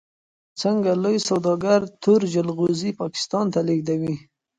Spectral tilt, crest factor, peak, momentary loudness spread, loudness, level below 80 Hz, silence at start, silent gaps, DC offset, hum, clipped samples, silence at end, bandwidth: -6 dB/octave; 16 dB; -6 dBFS; 7 LU; -22 LUFS; -64 dBFS; 0.55 s; none; under 0.1%; none; under 0.1%; 0.4 s; 9.4 kHz